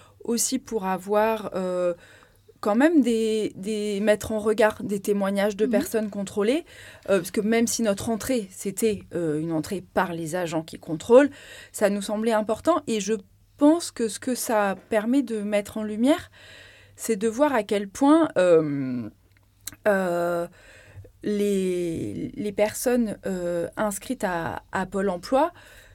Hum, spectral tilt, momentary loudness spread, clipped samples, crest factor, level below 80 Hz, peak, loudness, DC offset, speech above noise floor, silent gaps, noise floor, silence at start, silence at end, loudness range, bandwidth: none; -5 dB/octave; 11 LU; under 0.1%; 20 dB; -56 dBFS; -4 dBFS; -24 LUFS; under 0.1%; 34 dB; none; -58 dBFS; 0.25 s; 0.45 s; 4 LU; 17 kHz